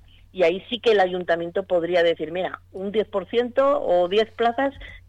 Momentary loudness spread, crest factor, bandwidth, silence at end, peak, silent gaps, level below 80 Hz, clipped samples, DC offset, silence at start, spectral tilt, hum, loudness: 8 LU; 12 dB; 8.4 kHz; 0.1 s; -10 dBFS; none; -54 dBFS; under 0.1%; under 0.1%; 0.35 s; -5.5 dB/octave; none; -22 LUFS